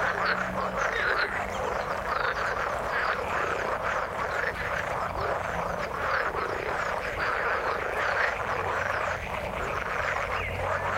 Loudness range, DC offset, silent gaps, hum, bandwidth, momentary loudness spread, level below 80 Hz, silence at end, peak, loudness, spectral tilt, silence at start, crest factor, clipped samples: 1 LU; under 0.1%; none; none; 16.5 kHz; 4 LU; -46 dBFS; 0 s; -12 dBFS; -28 LUFS; -4 dB/octave; 0 s; 18 dB; under 0.1%